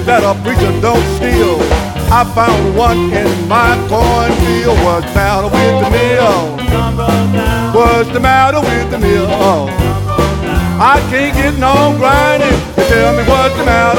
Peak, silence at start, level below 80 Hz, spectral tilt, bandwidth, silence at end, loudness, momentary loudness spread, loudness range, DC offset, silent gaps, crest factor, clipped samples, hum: 0 dBFS; 0 s; -20 dBFS; -6 dB/octave; 18 kHz; 0 s; -11 LUFS; 4 LU; 1 LU; under 0.1%; none; 10 dB; under 0.1%; none